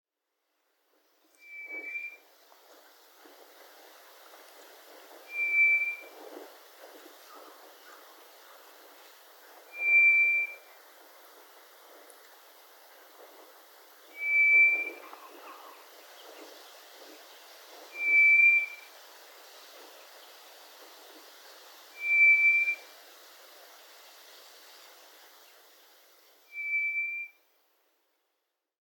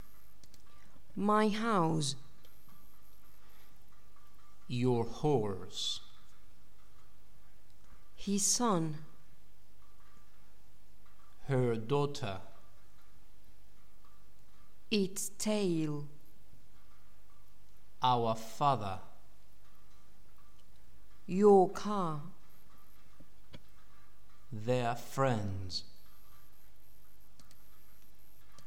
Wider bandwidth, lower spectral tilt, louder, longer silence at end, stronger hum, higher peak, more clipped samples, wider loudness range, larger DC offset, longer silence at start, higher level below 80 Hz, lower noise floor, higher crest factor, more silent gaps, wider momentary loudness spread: about the same, 18 kHz vs 16.5 kHz; second, 3.5 dB/octave vs -5 dB/octave; first, -23 LUFS vs -33 LUFS; second, 1.55 s vs 2.85 s; neither; about the same, -14 dBFS vs -14 dBFS; neither; first, 19 LU vs 8 LU; second, under 0.1% vs 1%; first, 1.5 s vs 1.15 s; second, under -90 dBFS vs -62 dBFS; first, -83 dBFS vs -64 dBFS; second, 18 dB vs 24 dB; neither; first, 30 LU vs 16 LU